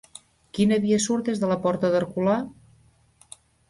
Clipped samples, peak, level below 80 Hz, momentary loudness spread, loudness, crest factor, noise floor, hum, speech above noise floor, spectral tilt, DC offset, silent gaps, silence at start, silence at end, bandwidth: under 0.1%; -10 dBFS; -60 dBFS; 5 LU; -23 LUFS; 14 dB; -59 dBFS; none; 36 dB; -5.5 dB/octave; under 0.1%; none; 0.55 s; 1.2 s; 11.5 kHz